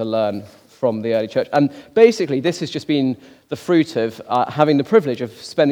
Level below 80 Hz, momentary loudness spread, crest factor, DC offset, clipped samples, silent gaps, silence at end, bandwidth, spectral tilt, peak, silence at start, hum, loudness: -66 dBFS; 11 LU; 18 dB; under 0.1%; under 0.1%; none; 0 s; 14.5 kHz; -6.5 dB/octave; 0 dBFS; 0 s; none; -18 LUFS